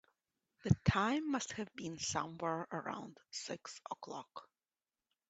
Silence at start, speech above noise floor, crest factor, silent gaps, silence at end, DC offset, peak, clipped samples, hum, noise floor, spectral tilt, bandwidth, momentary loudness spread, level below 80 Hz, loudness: 0.65 s; over 51 dB; 26 dB; none; 0.85 s; under 0.1%; -14 dBFS; under 0.1%; none; under -90 dBFS; -5 dB/octave; 8.2 kHz; 15 LU; -62 dBFS; -39 LUFS